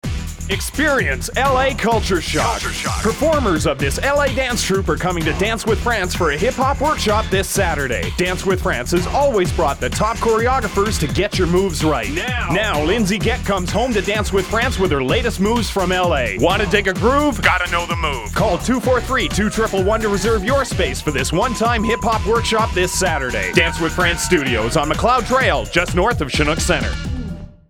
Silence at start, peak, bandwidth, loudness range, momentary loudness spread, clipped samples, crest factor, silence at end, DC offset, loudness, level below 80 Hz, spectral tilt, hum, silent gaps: 0.05 s; 0 dBFS; 19.5 kHz; 1 LU; 4 LU; under 0.1%; 18 dB; 0.2 s; under 0.1%; -17 LUFS; -28 dBFS; -4.5 dB/octave; none; none